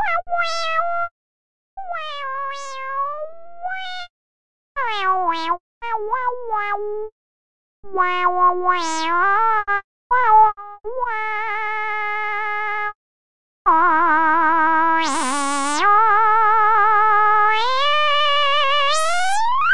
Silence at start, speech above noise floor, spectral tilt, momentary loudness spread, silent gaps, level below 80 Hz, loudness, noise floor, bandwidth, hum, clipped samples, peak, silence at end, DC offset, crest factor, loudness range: 0 s; over 71 dB; -1 dB/octave; 14 LU; 1.11-1.77 s, 4.10-4.75 s, 5.60-5.81 s, 7.12-7.83 s, 9.84-10.10 s, 12.95-13.65 s; -54 dBFS; -18 LUFS; under -90 dBFS; 11.5 kHz; none; under 0.1%; -4 dBFS; 0 s; 4%; 14 dB; 10 LU